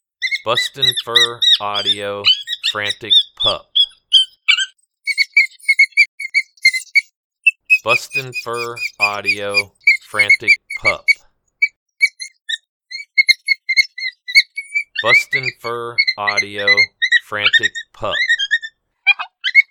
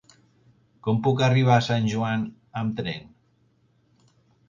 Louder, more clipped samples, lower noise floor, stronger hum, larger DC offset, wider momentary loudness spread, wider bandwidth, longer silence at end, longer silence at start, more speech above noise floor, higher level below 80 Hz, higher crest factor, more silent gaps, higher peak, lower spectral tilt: first, -14 LUFS vs -24 LUFS; neither; second, -41 dBFS vs -64 dBFS; neither; neither; second, 10 LU vs 13 LU; first, 19 kHz vs 7.4 kHz; second, 0.1 s vs 1.4 s; second, 0.2 s vs 0.85 s; second, 25 dB vs 42 dB; about the same, -56 dBFS vs -60 dBFS; about the same, 18 dB vs 20 dB; first, 6.08-6.18 s, 7.16-7.30 s, 11.76-11.86 s, 12.69-12.80 s vs none; first, 0 dBFS vs -6 dBFS; second, -0.5 dB/octave vs -6.5 dB/octave